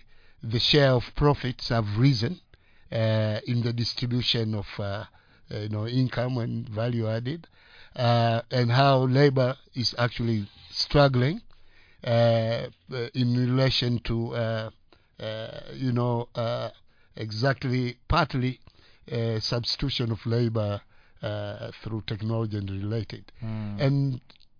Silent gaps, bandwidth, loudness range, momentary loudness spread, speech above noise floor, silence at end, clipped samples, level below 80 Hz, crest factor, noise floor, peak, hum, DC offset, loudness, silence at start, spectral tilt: none; 5.2 kHz; 6 LU; 15 LU; 27 dB; 0.4 s; under 0.1%; -46 dBFS; 20 dB; -52 dBFS; -8 dBFS; none; under 0.1%; -26 LUFS; 0.45 s; -7 dB/octave